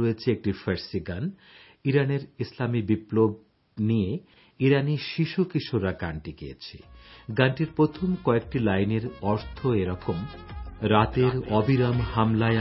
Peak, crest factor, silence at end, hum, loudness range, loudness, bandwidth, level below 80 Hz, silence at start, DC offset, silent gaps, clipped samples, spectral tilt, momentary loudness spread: -4 dBFS; 20 dB; 0 s; none; 2 LU; -26 LUFS; 5.8 kHz; -46 dBFS; 0 s; under 0.1%; none; under 0.1%; -11 dB/octave; 14 LU